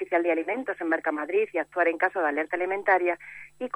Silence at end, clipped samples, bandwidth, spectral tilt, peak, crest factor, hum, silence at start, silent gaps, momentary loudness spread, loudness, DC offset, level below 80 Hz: 0.1 s; under 0.1%; 10.5 kHz; -5.5 dB/octave; -8 dBFS; 18 dB; none; 0 s; none; 7 LU; -26 LUFS; under 0.1%; -72 dBFS